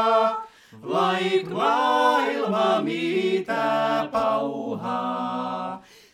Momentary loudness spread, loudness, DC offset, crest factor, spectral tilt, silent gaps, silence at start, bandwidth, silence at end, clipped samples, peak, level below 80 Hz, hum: 10 LU; -23 LUFS; under 0.1%; 16 dB; -5 dB/octave; none; 0 s; 14.5 kHz; 0.3 s; under 0.1%; -8 dBFS; -68 dBFS; none